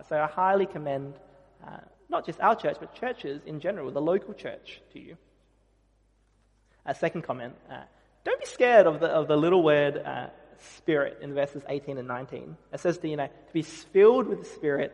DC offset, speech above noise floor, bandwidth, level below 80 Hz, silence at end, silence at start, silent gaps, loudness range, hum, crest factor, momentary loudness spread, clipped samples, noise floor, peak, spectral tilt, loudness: under 0.1%; 39 dB; 11 kHz; -66 dBFS; 0 s; 0.1 s; none; 12 LU; none; 22 dB; 22 LU; under 0.1%; -66 dBFS; -6 dBFS; -6 dB/octave; -27 LUFS